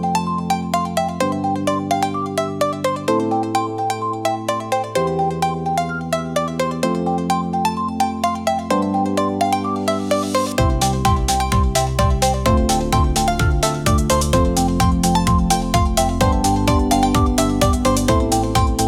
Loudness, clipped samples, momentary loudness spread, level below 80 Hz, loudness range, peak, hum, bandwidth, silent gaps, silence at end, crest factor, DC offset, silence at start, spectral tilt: -18 LUFS; under 0.1%; 5 LU; -26 dBFS; 4 LU; -4 dBFS; none; 18 kHz; none; 0 s; 14 dB; under 0.1%; 0 s; -5 dB/octave